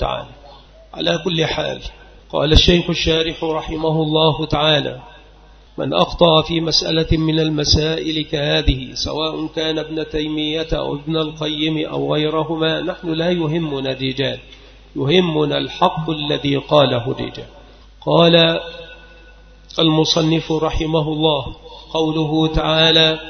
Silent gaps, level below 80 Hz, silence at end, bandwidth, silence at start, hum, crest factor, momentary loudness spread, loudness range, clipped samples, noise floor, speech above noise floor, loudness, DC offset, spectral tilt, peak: none; -32 dBFS; 0 s; 6.6 kHz; 0 s; none; 18 dB; 12 LU; 4 LU; under 0.1%; -45 dBFS; 27 dB; -17 LUFS; under 0.1%; -5.5 dB/octave; 0 dBFS